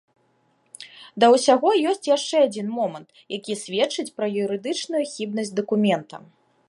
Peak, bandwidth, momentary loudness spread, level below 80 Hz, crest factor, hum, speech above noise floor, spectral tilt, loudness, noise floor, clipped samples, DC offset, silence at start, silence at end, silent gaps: -4 dBFS; 11.5 kHz; 22 LU; -76 dBFS; 20 dB; none; 43 dB; -4 dB/octave; -22 LUFS; -65 dBFS; under 0.1%; under 0.1%; 0.8 s; 0.5 s; none